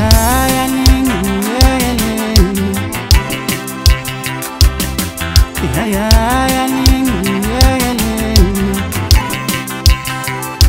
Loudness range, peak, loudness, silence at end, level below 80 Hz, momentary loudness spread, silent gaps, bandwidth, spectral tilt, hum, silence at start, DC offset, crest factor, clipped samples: 2 LU; 0 dBFS; -13 LUFS; 0 s; -16 dBFS; 6 LU; none; 16.5 kHz; -4.5 dB/octave; none; 0 s; under 0.1%; 12 dB; 0.5%